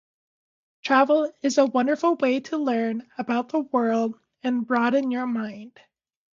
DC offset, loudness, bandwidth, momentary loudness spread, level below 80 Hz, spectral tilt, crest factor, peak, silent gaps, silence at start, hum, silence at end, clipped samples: under 0.1%; -23 LUFS; 7.6 kHz; 10 LU; -76 dBFS; -4.5 dB/octave; 18 dB; -8 dBFS; none; 0.85 s; none; 0.65 s; under 0.1%